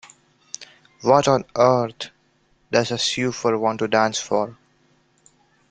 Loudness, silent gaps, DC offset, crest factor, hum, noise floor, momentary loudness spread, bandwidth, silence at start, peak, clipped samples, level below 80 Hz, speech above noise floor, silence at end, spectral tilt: -20 LUFS; none; under 0.1%; 22 dB; none; -62 dBFS; 18 LU; 9.4 kHz; 0.6 s; -2 dBFS; under 0.1%; -60 dBFS; 42 dB; 1.2 s; -4 dB/octave